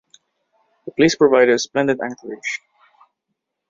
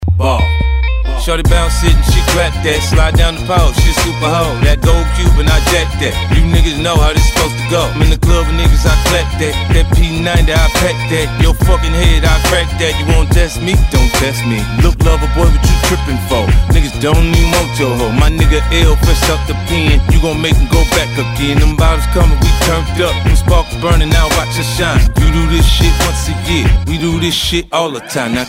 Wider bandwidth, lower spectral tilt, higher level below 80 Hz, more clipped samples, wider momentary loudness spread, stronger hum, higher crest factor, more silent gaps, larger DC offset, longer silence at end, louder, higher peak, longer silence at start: second, 7.6 kHz vs 16.5 kHz; about the same, -4.5 dB/octave vs -5 dB/octave; second, -60 dBFS vs -12 dBFS; neither; first, 17 LU vs 4 LU; neither; first, 18 dB vs 10 dB; neither; neither; first, 1.15 s vs 0 s; second, -18 LUFS vs -12 LUFS; about the same, -2 dBFS vs 0 dBFS; first, 0.85 s vs 0 s